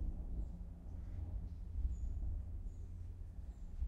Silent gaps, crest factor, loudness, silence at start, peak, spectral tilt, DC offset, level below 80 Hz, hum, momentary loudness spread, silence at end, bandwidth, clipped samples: none; 16 dB; -48 LUFS; 0 s; -28 dBFS; -9 dB/octave; under 0.1%; -44 dBFS; none; 8 LU; 0 s; 7.4 kHz; under 0.1%